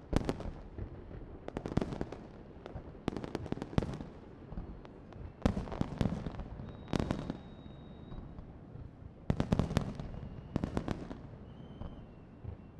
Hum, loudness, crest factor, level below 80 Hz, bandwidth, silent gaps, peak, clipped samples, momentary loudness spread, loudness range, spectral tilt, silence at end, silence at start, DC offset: none; -40 LUFS; 28 dB; -48 dBFS; 12 kHz; none; -12 dBFS; under 0.1%; 15 LU; 3 LU; -7.5 dB/octave; 0 s; 0 s; under 0.1%